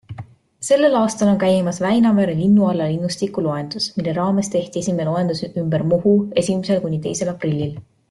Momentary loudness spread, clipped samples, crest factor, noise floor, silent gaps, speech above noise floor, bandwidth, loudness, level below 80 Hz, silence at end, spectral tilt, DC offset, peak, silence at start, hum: 8 LU; under 0.1%; 14 dB; -38 dBFS; none; 20 dB; 12 kHz; -19 LUFS; -54 dBFS; 0.3 s; -6 dB/octave; under 0.1%; -4 dBFS; 0.1 s; none